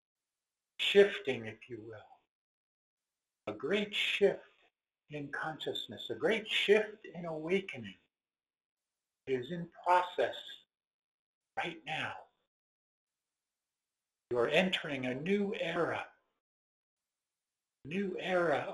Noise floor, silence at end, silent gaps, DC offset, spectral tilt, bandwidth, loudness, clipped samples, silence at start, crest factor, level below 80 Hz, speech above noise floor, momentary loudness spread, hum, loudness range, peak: under -90 dBFS; 0 s; 2.29-2.97 s, 8.66-8.77 s, 10.87-11.41 s, 12.47-13.07 s, 16.40-16.97 s; under 0.1%; -5 dB/octave; 12 kHz; -33 LUFS; under 0.1%; 0.8 s; 24 dB; -76 dBFS; over 56 dB; 19 LU; none; 6 LU; -12 dBFS